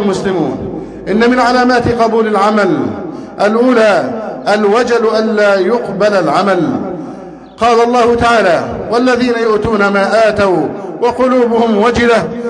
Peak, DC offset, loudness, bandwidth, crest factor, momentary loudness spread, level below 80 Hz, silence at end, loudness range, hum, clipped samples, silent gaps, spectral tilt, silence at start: 0 dBFS; under 0.1%; -11 LUFS; 10.5 kHz; 12 dB; 10 LU; -40 dBFS; 0 s; 1 LU; none; under 0.1%; none; -5.5 dB/octave; 0 s